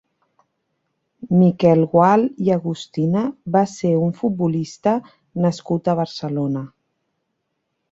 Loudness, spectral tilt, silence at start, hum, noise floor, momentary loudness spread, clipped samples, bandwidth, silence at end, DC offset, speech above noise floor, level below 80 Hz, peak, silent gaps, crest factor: -19 LUFS; -8 dB/octave; 1.2 s; none; -74 dBFS; 10 LU; under 0.1%; 7.8 kHz; 1.25 s; under 0.1%; 56 dB; -60 dBFS; -2 dBFS; none; 18 dB